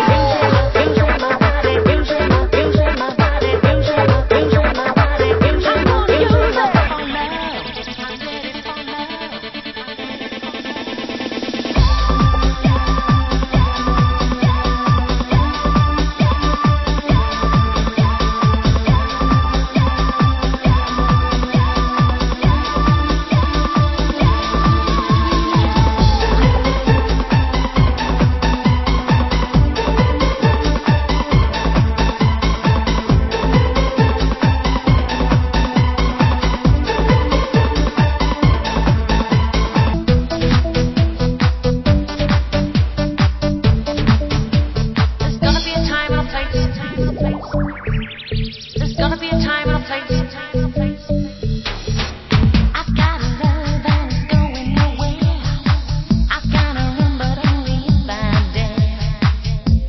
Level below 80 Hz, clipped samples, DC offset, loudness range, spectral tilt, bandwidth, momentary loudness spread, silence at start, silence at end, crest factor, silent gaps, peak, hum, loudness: -20 dBFS; under 0.1%; under 0.1%; 5 LU; -7 dB/octave; 6.2 kHz; 7 LU; 0 s; 0 s; 16 dB; none; 0 dBFS; none; -16 LUFS